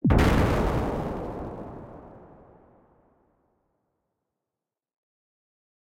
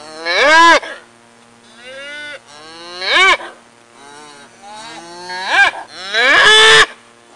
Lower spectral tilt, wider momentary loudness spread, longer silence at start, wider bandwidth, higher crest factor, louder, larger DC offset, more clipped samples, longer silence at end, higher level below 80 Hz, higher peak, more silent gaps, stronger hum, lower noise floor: first, -7 dB/octave vs 0 dB/octave; about the same, 24 LU vs 25 LU; about the same, 0.05 s vs 0.05 s; first, 16 kHz vs 11.5 kHz; first, 22 dB vs 14 dB; second, -26 LUFS vs -9 LUFS; neither; neither; first, 3.75 s vs 0.4 s; first, -36 dBFS vs -50 dBFS; second, -6 dBFS vs 0 dBFS; neither; neither; first, -89 dBFS vs -45 dBFS